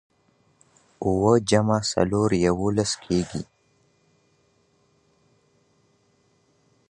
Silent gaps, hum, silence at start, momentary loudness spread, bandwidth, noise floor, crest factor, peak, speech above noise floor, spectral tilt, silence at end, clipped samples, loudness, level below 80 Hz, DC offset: none; none; 1 s; 11 LU; 11 kHz; -65 dBFS; 22 dB; -4 dBFS; 43 dB; -5.5 dB/octave; 3.45 s; under 0.1%; -23 LUFS; -50 dBFS; under 0.1%